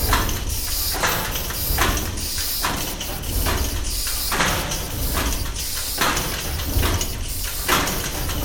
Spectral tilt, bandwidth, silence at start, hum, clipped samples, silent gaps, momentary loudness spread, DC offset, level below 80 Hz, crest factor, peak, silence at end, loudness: -2.5 dB/octave; 17.5 kHz; 0 s; none; under 0.1%; none; 5 LU; under 0.1%; -28 dBFS; 20 dB; -4 dBFS; 0 s; -22 LUFS